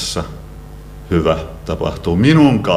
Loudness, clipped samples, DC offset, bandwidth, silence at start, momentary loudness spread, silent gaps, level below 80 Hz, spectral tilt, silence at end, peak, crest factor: -15 LUFS; under 0.1%; under 0.1%; 15 kHz; 0 s; 25 LU; none; -32 dBFS; -6 dB/octave; 0 s; 0 dBFS; 16 dB